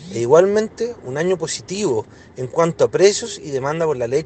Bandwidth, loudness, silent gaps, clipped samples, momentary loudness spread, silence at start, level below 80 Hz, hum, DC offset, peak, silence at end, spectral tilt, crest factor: 9 kHz; -19 LUFS; none; under 0.1%; 11 LU; 0 s; -56 dBFS; none; under 0.1%; 0 dBFS; 0 s; -4.5 dB/octave; 18 dB